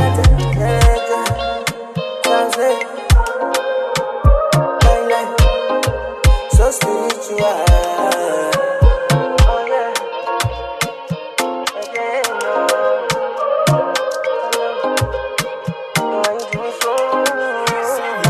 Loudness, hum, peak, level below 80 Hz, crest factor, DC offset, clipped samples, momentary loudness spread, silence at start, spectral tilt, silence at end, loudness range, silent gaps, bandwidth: -17 LUFS; none; 0 dBFS; -20 dBFS; 14 dB; under 0.1%; under 0.1%; 8 LU; 0 s; -4.5 dB/octave; 0 s; 4 LU; none; 14 kHz